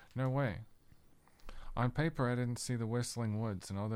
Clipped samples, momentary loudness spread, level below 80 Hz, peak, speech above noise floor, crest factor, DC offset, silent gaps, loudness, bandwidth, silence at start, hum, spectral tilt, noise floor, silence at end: under 0.1%; 12 LU; -54 dBFS; -20 dBFS; 27 dB; 16 dB; under 0.1%; none; -37 LUFS; 14.5 kHz; 0 s; none; -6 dB/octave; -63 dBFS; 0 s